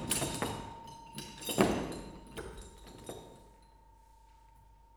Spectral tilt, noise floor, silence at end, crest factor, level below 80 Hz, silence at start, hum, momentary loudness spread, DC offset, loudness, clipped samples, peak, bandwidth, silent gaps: -4 dB/octave; -60 dBFS; 0 s; 30 dB; -54 dBFS; 0 s; none; 20 LU; under 0.1%; -37 LUFS; under 0.1%; -10 dBFS; over 20 kHz; none